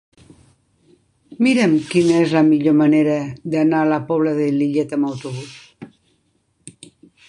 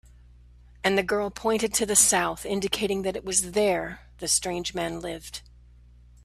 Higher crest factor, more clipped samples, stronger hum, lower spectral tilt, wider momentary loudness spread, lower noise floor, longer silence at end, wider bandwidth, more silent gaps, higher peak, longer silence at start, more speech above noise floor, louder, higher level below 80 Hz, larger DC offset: second, 16 dB vs 24 dB; neither; second, none vs 60 Hz at -50 dBFS; first, -6.5 dB/octave vs -2 dB/octave; second, 13 LU vs 16 LU; first, -64 dBFS vs -52 dBFS; second, 0.6 s vs 0.85 s; second, 11 kHz vs 15.5 kHz; neither; about the same, -2 dBFS vs -4 dBFS; first, 1.3 s vs 0.85 s; first, 48 dB vs 26 dB; first, -17 LUFS vs -25 LUFS; second, -62 dBFS vs -50 dBFS; neither